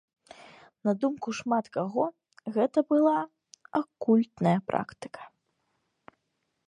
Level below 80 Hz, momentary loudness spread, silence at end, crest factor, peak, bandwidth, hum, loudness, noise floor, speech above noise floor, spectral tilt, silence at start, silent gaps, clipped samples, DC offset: -72 dBFS; 17 LU; 1.4 s; 20 dB; -10 dBFS; 10 kHz; none; -28 LUFS; -79 dBFS; 52 dB; -7.5 dB/octave; 0.85 s; none; under 0.1%; under 0.1%